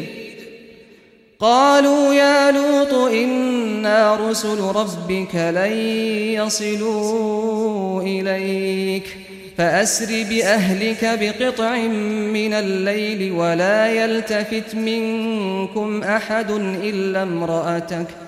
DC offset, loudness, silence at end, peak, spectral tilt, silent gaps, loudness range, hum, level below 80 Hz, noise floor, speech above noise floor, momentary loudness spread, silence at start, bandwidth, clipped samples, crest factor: under 0.1%; -19 LUFS; 0 s; -2 dBFS; -4.5 dB/octave; none; 5 LU; none; -58 dBFS; -49 dBFS; 31 dB; 8 LU; 0 s; 15.5 kHz; under 0.1%; 16 dB